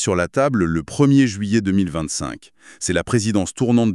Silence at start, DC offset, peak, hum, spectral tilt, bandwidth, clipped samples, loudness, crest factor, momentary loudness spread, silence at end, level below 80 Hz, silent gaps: 0 s; under 0.1%; -4 dBFS; none; -5.5 dB/octave; 12 kHz; under 0.1%; -19 LUFS; 14 dB; 10 LU; 0 s; -44 dBFS; none